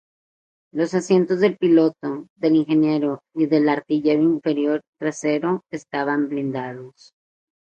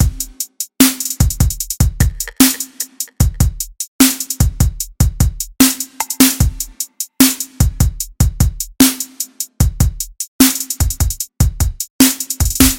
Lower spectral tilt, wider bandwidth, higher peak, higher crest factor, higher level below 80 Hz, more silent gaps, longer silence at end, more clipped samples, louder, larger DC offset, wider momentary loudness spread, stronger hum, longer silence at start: first, -6.5 dB/octave vs -3.5 dB/octave; second, 8.8 kHz vs over 20 kHz; second, -6 dBFS vs 0 dBFS; about the same, 16 dB vs 16 dB; second, -68 dBFS vs -22 dBFS; second, 2.30-2.36 s, 4.88-4.93 s vs 3.88-3.99 s, 10.28-10.39 s, 11.90-11.99 s; first, 0.75 s vs 0 s; second, under 0.1% vs 0.2%; second, -21 LUFS vs -15 LUFS; neither; about the same, 11 LU vs 11 LU; neither; first, 0.75 s vs 0 s